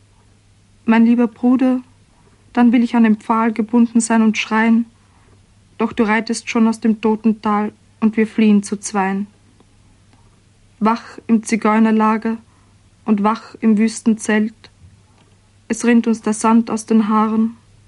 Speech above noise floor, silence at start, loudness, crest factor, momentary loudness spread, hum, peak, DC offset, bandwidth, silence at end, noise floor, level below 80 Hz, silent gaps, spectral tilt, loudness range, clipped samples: 36 dB; 0.85 s; -16 LUFS; 14 dB; 9 LU; none; -4 dBFS; under 0.1%; 11.5 kHz; 0.35 s; -51 dBFS; -56 dBFS; none; -5.5 dB/octave; 4 LU; under 0.1%